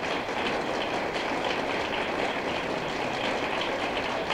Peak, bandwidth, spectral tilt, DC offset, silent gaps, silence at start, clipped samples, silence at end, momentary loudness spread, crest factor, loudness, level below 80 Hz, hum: -14 dBFS; 16 kHz; -4 dB/octave; under 0.1%; none; 0 s; under 0.1%; 0 s; 1 LU; 14 dB; -29 LUFS; -54 dBFS; none